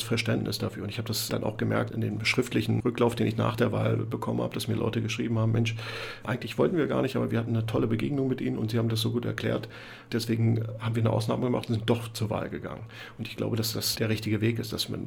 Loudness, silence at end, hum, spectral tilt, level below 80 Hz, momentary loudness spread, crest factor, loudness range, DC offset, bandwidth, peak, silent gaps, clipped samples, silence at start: -29 LUFS; 0 s; none; -6 dB/octave; -56 dBFS; 8 LU; 18 dB; 2 LU; under 0.1%; 17.5 kHz; -10 dBFS; none; under 0.1%; 0 s